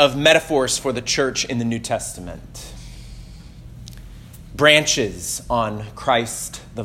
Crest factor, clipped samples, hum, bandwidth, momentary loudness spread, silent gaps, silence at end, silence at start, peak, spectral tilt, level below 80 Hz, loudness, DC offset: 22 dB; under 0.1%; none; 16.5 kHz; 25 LU; none; 0 s; 0 s; 0 dBFS; -3 dB/octave; -42 dBFS; -19 LUFS; under 0.1%